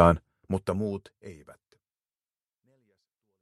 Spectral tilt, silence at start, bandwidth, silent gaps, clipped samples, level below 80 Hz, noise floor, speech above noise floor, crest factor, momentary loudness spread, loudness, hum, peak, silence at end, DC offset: -8 dB/octave; 0 s; 12 kHz; none; under 0.1%; -48 dBFS; under -90 dBFS; over 64 dB; 28 dB; 21 LU; -29 LUFS; none; -2 dBFS; 2.1 s; under 0.1%